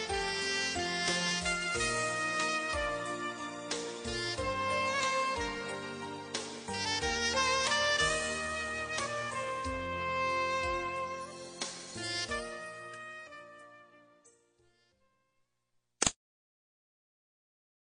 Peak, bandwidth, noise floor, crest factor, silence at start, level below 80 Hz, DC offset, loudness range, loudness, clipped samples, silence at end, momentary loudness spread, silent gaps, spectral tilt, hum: -8 dBFS; 10 kHz; -79 dBFS; 28 dB; 0 s; -56 dBFS; under 0.1%; 10 LU; -33 LUFS; under 0.1%; 1.85 s; 13 LU; none; -2 dB/octave; none